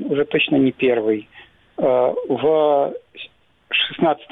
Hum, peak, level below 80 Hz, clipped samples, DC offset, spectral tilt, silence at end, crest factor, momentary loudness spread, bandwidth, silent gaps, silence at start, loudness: none; -6 dBFS; -60 dBFS; under 0.1%; under 0.1%; -8 dB/octave; 0.1 s; 14 dB; 19 LU; 4.1 kHz; none; 0 s; -19 LUFS